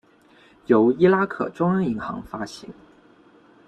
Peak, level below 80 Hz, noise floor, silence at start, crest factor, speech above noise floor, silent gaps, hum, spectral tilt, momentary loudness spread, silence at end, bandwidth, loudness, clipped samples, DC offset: -4 dBFS; -58 dBFS; -54 dBFS; 0.7 s; 20 dB; 33 dB; none; none; -8 dB/octave; 17 LU; 0.95 s; 9.4 kHz; -21 LUFS; under 0.1%; under 0.1%